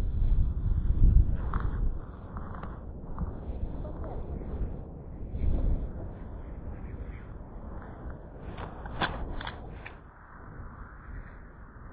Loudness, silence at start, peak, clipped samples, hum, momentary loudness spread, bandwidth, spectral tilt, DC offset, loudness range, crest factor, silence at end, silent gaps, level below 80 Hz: -35 LUFS; 0 s; -10 dBFS; under 0.1%; none; 16 LU; 4 kHz; -10 dB/octave; under 0.1%; 8 LU; 22 dB; 0 s; none; -32 dBFS